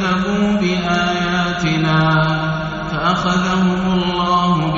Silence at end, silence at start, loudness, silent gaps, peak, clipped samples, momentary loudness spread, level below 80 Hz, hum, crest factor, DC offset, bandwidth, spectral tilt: 0 s; 0 s; -16 LUFS; none; -4 dBFS; under 0.1%; 4 LU; -38 dBFS; none; 12 dB; under 0.1%; 7.6 kHz; -4.5 dB/octave